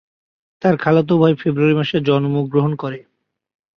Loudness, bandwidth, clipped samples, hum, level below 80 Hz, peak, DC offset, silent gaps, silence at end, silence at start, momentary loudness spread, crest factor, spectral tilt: -17 LUFS; 6.4 kHz; under 0.1%; none; -58 dBFS; -2 dBFS; under 0.1%; none; 0.8 s; 0.6 s; 8 LU; 16 dB; -9 dB/octave